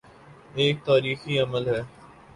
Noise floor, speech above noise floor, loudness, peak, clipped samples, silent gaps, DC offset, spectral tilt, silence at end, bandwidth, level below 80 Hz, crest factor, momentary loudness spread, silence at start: -50 dBFS; 26 dB; -24 LUFS; -8 dBFS; under 0.1%; none; under 0.1%; -6 dB/octave; 0.3 s; 11.5 kHz; -58 dBFS; 18 dB; 11 LU; 0.25 s